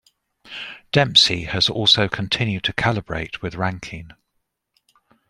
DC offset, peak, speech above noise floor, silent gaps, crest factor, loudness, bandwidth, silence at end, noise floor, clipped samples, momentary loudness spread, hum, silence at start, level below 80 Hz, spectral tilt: under 0.1%; -2 dBFS; 54 dB; none; 22 dB; -18 LUFS; 15.5 kHz; 1.2 s; -74 dBFS; under 0.1%; 19 LU; none; 0.45 s; -48 dBFS; -4 dB/octave